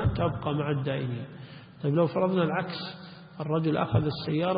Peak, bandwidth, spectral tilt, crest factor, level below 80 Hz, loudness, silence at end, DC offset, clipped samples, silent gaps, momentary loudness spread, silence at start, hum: -10 dBFS; 5.2 kHz; -11.5 dB/octave; 18 dB; -50 dBFS; -29 LUFS; 0 s; under 0.1%; under 0.1%; none; 16 LU; 0 s; none